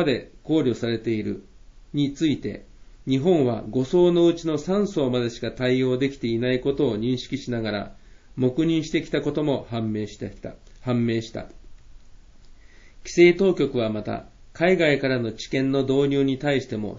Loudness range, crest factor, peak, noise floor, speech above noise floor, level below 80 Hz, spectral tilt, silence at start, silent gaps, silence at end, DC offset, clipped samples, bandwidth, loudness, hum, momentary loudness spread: 6 LU; 20 dB; -4 dBFS; -47 dBFS; 24 dB; -48 dBFS; -6.5 dB/octave; 0 s; none; 0 s; under 0.1%; under 0.1%; 7.6 kHz; -23 LUFS; none; 15 LU